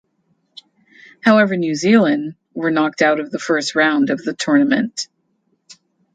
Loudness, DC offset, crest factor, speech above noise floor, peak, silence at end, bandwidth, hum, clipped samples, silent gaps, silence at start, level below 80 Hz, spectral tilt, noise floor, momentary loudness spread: -17 LUFS; under 0.1%; 18 dB; 50 dB; 0 dBFS; 0.4 s; 9.2 kHz; none; under 0.1%; none; 1.25 s; -66 dBFS; -5 dB/octave; -66 dBFS; 10 LU